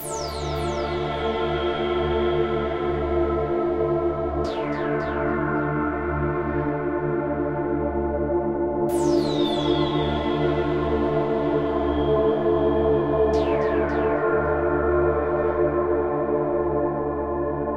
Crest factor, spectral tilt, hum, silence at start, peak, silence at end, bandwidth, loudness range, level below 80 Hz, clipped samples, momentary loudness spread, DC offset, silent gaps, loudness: 14 dB; -7 dB/octave; none; 0 s; -10 dBFS; 0 s; 14.5 kHz; 3 LU; -36 dBFS; under 0.1%; 5 LU; under 0.1%; none; -23 LUFS